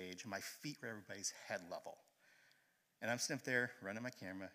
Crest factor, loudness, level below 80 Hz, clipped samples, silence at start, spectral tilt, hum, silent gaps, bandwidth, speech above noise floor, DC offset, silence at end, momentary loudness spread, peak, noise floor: 24 dB; -45 LUFS; under -90 dBFS; under 0.1%; 0 s; -3 dB/octave; none; none; 15.5 kHz; 32 dB; under 0.1%; 0 s; 12 LU; -22 dBFS; -77 dBFS